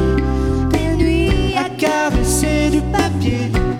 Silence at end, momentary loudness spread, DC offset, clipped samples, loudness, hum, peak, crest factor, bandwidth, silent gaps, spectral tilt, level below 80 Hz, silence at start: 0 s; 3 LU; under 0.1%; under 0.1%; -17 LUFS; none; -2 dBFS; 14 dB; 16.5 kHz; none; -5.5 dB/octave; -22 dBFS; 0 s